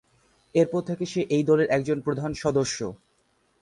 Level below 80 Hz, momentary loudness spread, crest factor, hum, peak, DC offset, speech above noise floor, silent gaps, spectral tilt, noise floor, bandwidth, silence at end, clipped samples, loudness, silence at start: -58 dBFS; 8 LU; 16 dB; none; -10 dBFS; under 0.1%; 43 dB; none; -6 dB/octave; -68 dBFS; 11.5 kHz; 0.65 s; under 0.1%; -25 LUFS; 0.55 s